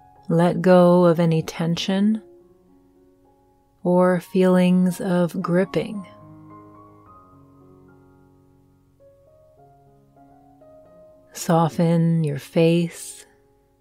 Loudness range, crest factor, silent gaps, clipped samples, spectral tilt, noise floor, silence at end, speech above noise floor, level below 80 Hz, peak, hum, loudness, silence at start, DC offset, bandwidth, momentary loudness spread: 9 LU; 18 dB; none; under 0.1%; -7 dB/octave; -59 dBFS; 0.65 s; 40 dB; -62 dBFS; -4 dBFS; none; -20 LUFS; 0.3 s; under 0.1%; 15 kHz; 15 LU